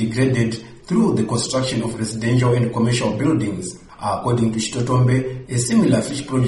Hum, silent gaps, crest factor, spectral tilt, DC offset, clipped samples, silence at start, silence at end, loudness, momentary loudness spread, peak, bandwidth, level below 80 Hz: none; none; 14 dB; -6 dB/octave; under 0.1%; under 0.1%; 0 s; 0 s; -19 LUFS; 8 LU; -4 dBFS; 11.5 kHz; -46 dBFS